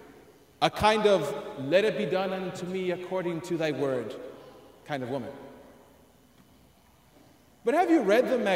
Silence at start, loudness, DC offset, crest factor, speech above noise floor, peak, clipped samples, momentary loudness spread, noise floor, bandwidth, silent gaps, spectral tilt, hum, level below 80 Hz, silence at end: 0 s; -27 LUFS; under 0.1%; 22 dB; 33 dB; -8 dBFS; under 0.1%; 17 LU; -60 dBFS; 16 kHz; none; -5.5 dB/octave; none; -60 dBFS; 0 s